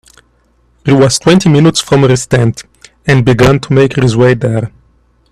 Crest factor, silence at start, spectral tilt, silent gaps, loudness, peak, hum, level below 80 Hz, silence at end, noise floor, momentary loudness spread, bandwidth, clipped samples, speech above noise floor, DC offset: 10 dB; 0.85 s; -6 dB/octave; none; -9 LUFS; 0 dBFS; 60 Hz at -30 dBFS; -36 dBFS; 0.65 s; -52 dBFS; 10 LU; 13 kHz; under 0.1%; 44 dB; under 0.1%